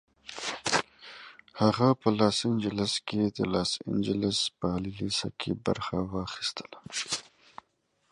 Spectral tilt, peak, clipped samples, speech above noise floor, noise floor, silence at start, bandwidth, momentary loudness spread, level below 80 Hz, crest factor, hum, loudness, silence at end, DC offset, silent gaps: -4.5 dB/octave; -8 dBFS; under 0.1%; 44 dB; -73 dBFS; 0.25 s; 11.5 kHz; 12 LU; -56 dBFS; 22 dB; none; -29 LUFS; 0.9 s; under 0.1%; none